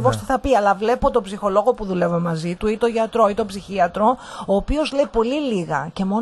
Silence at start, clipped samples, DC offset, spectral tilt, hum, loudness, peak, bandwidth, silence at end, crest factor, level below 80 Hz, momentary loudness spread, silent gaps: 0 s; under 0.1%; under 0.1%; -6.5 dB/octave; none; -20 LUFS; -4 dBFS; 12 kHz; 0 s; 16 dB; -38 dBFS; 5 LU; none